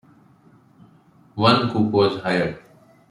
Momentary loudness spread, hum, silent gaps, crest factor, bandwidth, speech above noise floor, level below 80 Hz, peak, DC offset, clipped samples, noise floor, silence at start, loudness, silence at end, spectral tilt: 16 LU; none; none; 20 dB; 11 kHz; 35 dB; -58 dBFS; -2 dBFS; under 0.1%; under 0.1%; -53 dBFS; 1.35 s; -20 LUFS; 0.5 s; -7 dB/octave